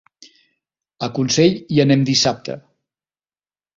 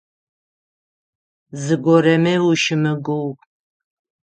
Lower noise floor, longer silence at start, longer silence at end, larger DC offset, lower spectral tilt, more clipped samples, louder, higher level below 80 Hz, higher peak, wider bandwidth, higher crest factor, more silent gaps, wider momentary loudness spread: about the same, under -90 dBFS vs under -90 dBFS; second, 1 s vs 1.55 s; first, 1.2 s vs 0.9 s; neither; about the same, -5 dB/octave vs -6 dB/octave; neither; about the same, -17 LUFS vs -17 LUFS; first, -56 dBFS vs -66 dBFS; about the same, -2 dBFS vs -2 dBFS; second, 7.6 kHz vs 9 kHz; about the same, 18 dB vs 18 dB; neither; about the same, 15 LU vs 15 LU